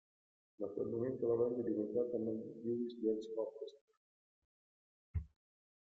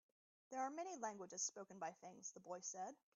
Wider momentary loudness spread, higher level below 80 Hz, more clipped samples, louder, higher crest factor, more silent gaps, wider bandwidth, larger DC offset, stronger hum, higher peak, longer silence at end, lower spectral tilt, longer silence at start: first, 11 LU vs 8 LU; first, -62 dBFS vs under -90 dBFS; neither; first, -40 LUFS vs -50 LUFS; about the same, 16 dB vs 18 dB; first, 3.81-3.88 s, 3.97-5.14 s vs none; about the same, 7.4 kHz vs 8 kHz; neither; neither; first, -24 dBFS vs -32 dBFS; first, 0.55 s vs 0.2 s; first, -9.5 dB/octave vs -3 dB/octave; about the same, 0.6 s vs 0.5 s